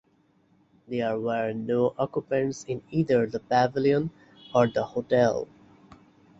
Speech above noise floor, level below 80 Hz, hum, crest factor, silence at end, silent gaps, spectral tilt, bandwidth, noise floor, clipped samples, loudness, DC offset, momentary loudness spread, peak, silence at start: 39 dB; -62 dBFS; none; 20 dB; 0.95 s; none; -6.5 dB/octave; 7.8 kHz; -65 dBFS; under 0.1%; -26 LUFS; under 0.1%; 8 LU; -6 dBFS; 0.9 s